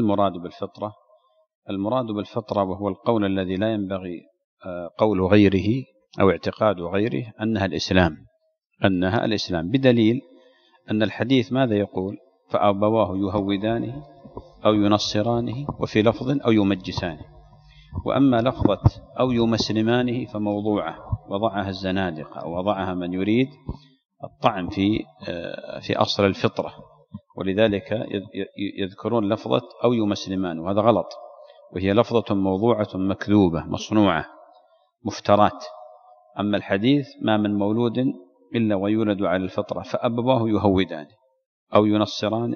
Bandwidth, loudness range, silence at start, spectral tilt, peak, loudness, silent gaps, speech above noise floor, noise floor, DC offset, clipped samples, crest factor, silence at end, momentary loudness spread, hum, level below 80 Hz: 7 kHz; 4 LU; 0 s; -7 dB/octave; -2 dBFS; -23 LUFS; 1.55-1.62 s, 4.44-4.57 s, 41.46-41.67 s; 47 dB; -69 dBFS; under 0.1%; under 0.1%; 22 dB; 0 s; 14 LU; none; -48 dBFS